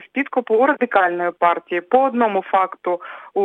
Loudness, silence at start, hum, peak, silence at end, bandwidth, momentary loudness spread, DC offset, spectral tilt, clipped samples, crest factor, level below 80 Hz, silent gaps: -19 LUFS; 0 s; none; -2 dBFS; 0 s; 9.2 kHz; 9 LU; under 0.1%; -7 dB/octave; under 0.1%; 16 dB; -68 dBFS; none